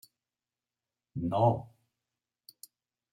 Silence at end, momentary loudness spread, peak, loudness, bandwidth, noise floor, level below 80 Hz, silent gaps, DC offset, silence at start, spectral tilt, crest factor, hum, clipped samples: 1.45 s; 25 LU; -14 dBFS; -30 LUFS; 16.5 kHz; under -90 dBFS; -68 dBFS; none; under 0.1%; 1.15 s; -8.5 dB/octave; 22 dB; none; under 0.1%